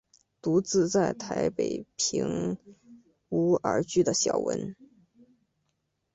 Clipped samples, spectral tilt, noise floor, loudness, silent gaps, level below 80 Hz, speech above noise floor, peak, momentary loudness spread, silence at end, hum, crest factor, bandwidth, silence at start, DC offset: under 0.1%; -4.5 dB/octave; -78 dBFS; -28 LUFS; none; -62 dBFS; 51 dB; -12 dBFS; 9 LU; 1.3 s; none; 18 dB; 8.2 kHz; 0.45 s; under 0.1%